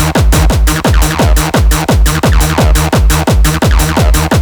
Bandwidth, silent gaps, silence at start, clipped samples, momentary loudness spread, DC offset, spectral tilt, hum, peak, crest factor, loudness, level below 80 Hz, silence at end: over 20 kHz; none; 0 s; under 0.1%; 1 LU; under 0.1%; -5 dB/octave; none; 0 dBFS; 8 dB; -10 LUFS; -10 dBFS; 0 s